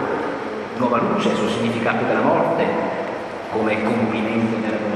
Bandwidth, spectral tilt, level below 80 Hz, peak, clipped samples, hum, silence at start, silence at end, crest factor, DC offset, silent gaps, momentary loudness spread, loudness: 11.5 kHz; -6.5 dB/octave; -56 dBFS; -4 dBFS; under 0.1%; none; 0 s; 0 s; 16 dB; under 0.1%; none; 8 LU; -21 LUFS